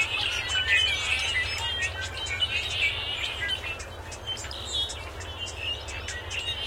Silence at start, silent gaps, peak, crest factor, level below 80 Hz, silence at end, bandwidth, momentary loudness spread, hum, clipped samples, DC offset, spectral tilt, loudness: 0 s; none; -10 dBFS; 20 dB; -44 dBFS; 0 s; 16.5 kHz; 12 LU; none; under 0.1%; under 0.1%; -1 dB/octave; -27 LUFS